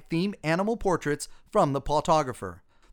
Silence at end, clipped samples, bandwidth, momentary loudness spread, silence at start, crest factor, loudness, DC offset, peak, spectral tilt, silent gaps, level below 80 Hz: 0.35 s; under 0.1%; 19.5 kHz; 9 LU; 0.1 s; 18 dB; -27 LUFS; under 0.1%; -10 dBFS; -5.5 dB/octave; none; -46 dBFS